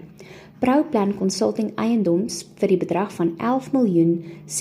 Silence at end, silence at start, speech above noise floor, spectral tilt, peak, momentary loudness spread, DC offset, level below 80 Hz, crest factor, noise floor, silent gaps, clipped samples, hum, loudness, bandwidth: 0 s; 0 s; 23 dB; -6 dB/octave; -8 dBFS; 6 LU; under 0.1%; -60 dBFS; 14 dB; -43 dBFS; none; under 0.1%; none; -21 LUFS; 15 kHz